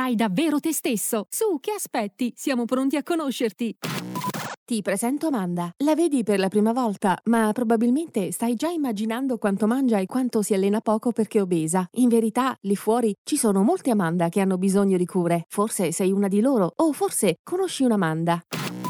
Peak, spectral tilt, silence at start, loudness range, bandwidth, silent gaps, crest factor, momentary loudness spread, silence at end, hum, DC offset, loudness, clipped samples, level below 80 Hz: -8 dBFS; -5.5 dB/octave; 0 s; 4 LU; over 20 kHz; 4.57-4.66 s, 13.18-13.25 s, 17.39-17.45 s; 14 dB; 6 LU; 0 s; none; under 0.1%; -23 LUFS; under 0.1%; -70 dBFS